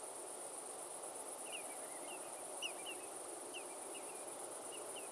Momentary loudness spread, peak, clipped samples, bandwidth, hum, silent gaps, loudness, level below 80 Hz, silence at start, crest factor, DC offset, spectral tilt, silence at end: 3 LU; -32 dBFS; under 0.1%; 12 kHz; none; none; -46 LUFS; under -90 dBFS; 0 s; 16 dB; under 0.1%; 0 dB/octave; 0 s